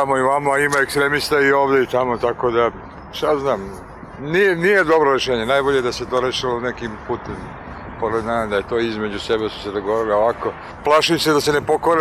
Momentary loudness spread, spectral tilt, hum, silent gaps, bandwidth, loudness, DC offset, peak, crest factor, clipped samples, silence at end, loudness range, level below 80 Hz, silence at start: 13 LU; -4.5 dB/octave; none; none; 15.5 kHz; -18 LUFS; under 0.1%; -6 dBFS; 12 dB; under 0.1%; 0 s; 5 LU; -44 dBFS; 0 s